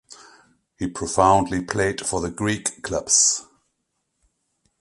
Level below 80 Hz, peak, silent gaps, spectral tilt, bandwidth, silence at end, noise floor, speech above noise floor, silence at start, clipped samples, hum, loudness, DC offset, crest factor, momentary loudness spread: -46 dBFS; -2 dBFS; none; -3 dB/octave; 11.5 kHz; 1.4 s; -75 dBFS; 54 dB; 0.1 s; under 0.1%; none; -21 LUFS; under 0.1%; 22 dB; 13 LU